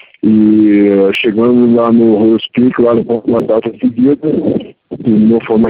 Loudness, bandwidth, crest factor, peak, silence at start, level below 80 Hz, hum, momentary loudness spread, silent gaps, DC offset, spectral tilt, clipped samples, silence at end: -10 LUFS; 4.5 kHz; 10 dB; 0 dBFS; 0.25 s; -48 dBFS; none; 6 LU; none; under 0.1%; -9 dB/octave; under 0.1%; 0 s